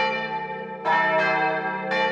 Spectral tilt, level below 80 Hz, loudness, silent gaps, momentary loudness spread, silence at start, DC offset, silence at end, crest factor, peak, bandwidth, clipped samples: -5 dB/octave; -78 dBFS; -23 LUFS; none; 9 LU; 0 s; under 0.1%; 0 s; 14 dB; -10 dBFS; 8.2 kHz; under 0.1%